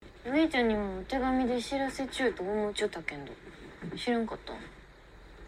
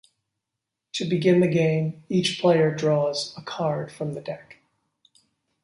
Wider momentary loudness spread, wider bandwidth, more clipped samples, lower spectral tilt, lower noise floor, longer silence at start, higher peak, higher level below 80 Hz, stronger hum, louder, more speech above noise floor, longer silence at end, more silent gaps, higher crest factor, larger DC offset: first, 17 LU vs 13 LU; first, 14 kHz vs 11.5 kHz; neither; second, -4.5 dB/octave vs -6 dB/octave; second, -53 dBFS vs -84 dBFS; second, 0 s vs 0.95 s; second, -16 dBFS vs -8 dBFS; first, -52 dBFS vs -66 dBFS; neither; second, -31 LUFS vs -24 LUFS; second, 22 dB vs 61 dB; second, 0 s vs 1.1 s; neither; about the same, 16 dB vs 18 dB; neither